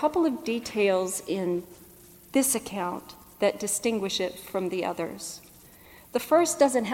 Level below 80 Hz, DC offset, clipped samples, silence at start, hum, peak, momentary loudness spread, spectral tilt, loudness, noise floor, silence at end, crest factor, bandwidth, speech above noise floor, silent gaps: -62 dBFS; under 0.1%; under 0.1%; 0 s; none; -8 dBFS; 12 LU; -3.5 dB/octave; -27 LUFS; -52 dBFS; 0 s; 20 dB; 17.5 kHz; 25 dB; none